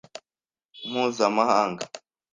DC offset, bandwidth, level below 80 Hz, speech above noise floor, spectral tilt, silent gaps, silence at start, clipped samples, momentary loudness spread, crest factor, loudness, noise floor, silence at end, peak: under 0.1%; 9.8 kHz; -72 dBFS; over 66 dB; -4 dB/octave; none; 0.15 s; under 0.1%; 23 LU; 20 dB; -24 LUFS; under -90 dBFS; 0.35 s; -6 dBFS